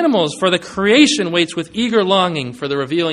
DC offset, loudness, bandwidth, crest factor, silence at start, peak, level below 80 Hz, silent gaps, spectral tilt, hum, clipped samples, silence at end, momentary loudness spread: under 0.1%; -15 LUFS; 11.5 kHz; 16 dB; 0 s; 0 dBFS; -54 dBFS; none; -4 dB/octave; none; under 0.1%; 0 s; 9 LU